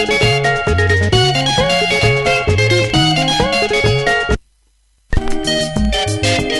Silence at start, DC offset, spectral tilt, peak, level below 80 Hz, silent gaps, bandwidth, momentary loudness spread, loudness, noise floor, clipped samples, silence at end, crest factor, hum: 0 s; under 0.1%; -4.5 dB/octave; 0 dBFS; -26 dBFS; none; 12 kHz; 6 LU; -14 LUFS; -56 dBFS; under 0.1%; 0 s; 14 dB; none